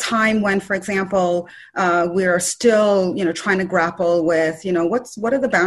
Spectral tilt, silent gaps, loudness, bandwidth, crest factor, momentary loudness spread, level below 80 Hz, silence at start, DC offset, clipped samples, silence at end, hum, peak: -4.5 dB/octave; none; -18 LUFS; 12.5 kHz; 14 dB; 6 LU; -56 dBFS; 0 s; under 0.1%; under 0.1%; 0 s; none; -4 dBFS